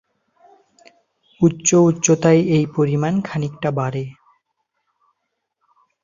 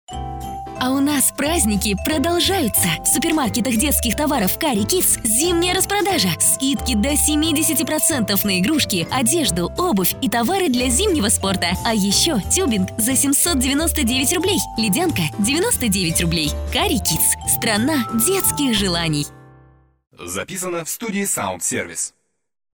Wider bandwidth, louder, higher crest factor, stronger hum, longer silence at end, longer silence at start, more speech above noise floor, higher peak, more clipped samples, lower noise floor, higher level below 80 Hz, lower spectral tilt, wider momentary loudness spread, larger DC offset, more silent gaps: second, 7.6 kHz vs over 20 kHz; about the same, -18 LUFS vs -17 LUFS; about the same, 18 dB vs 14 dB; neither; first, 1.9 s vs 0.65 s; first, 1.4 s vs 0.1 s; first, 59 dB vs 33 dB; about the same, -2 dBFS vs -4 dBFS; neither; first, -76 dBFS vs -51 dBFS; second, -58 dBFS vs -34 dBFS; first, -6 dB/octave vs -3 dB/octave; first, 11 LU vs 7 LU; neither; neither